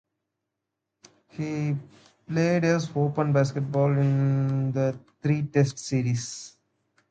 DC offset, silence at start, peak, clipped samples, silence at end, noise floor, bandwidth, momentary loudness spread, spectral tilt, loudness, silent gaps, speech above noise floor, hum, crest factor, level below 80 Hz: under 0.1%; 1.35 s; -8 dBFS; under 0.1%; 0.6 s; -84 dBFS; 9 kHz; 11 LU; -7 dB/octave; -26 LUFS; none; 59 dB; none; 18 dB; -64 dBFS